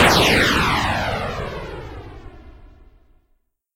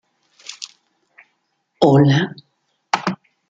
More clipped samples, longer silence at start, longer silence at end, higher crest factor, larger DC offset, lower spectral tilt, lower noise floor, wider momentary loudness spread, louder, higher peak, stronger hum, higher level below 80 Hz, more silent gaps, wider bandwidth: neither; second, 0 s vs 0.5 s; first, 1.1 s vs 0.35 s; about the same, 16 dB vs 20 dB; neither; second, -3.5 dB/octave vs -6.5 dB/octave; second, -65 dBFS vs -69 dBFS; about the same, 23 LU vs 23 LU; about the same, -18 LUFS vs -17 LUFS; second, -4 dBFS vs 0 dBFS; neither; first, -36 dBFS vs -60 dBFS; neither; first, 16 kHz vs 7.8 kHz